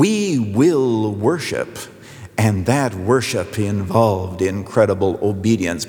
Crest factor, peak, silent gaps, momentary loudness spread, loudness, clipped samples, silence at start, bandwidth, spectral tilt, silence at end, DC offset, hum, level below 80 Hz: 16 dB; -2 dBFS; none; 9 LU; -18 LUFS; under 0.1%; 0 s; 19.5 kHz; -6 dB/octave; 0 s; under 0.1%; none; -54 dBFS